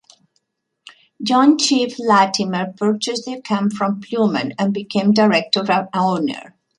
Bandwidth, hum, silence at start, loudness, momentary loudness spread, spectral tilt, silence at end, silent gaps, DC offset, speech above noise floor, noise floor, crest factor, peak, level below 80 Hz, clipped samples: 11 kHz; none; 1.2 s; -18 LUFS; 9 LU; -4.5 dB/octave; 0.3 s; none; under 0.1%; 53 dB; -70 dBFS; 16 dB; -2 dBFS; -66 dBFS; under 0.1%